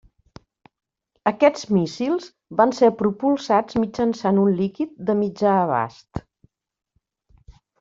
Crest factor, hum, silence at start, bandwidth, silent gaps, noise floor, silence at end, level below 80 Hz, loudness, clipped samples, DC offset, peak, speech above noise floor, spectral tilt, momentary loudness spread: 20 dB; none; 1.25 s; 7.6 kHz; none; -82 dBFS; 0.3 s; -56 dBFS; -21 LUFS; under 0.1%; under 0.1%; -2 dBFS; 62 dB; -7 dB/octave; 9 LU